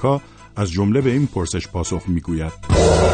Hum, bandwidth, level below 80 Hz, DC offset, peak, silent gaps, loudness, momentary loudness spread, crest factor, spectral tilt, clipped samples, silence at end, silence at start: none; 9.4 kHz; -30 dBFS; under 0.1%; -2 dBFS; none; -20 LUFS; 10 LU; 16 dB; -6 dB/octave; under 0.1%; 0 s; 0 s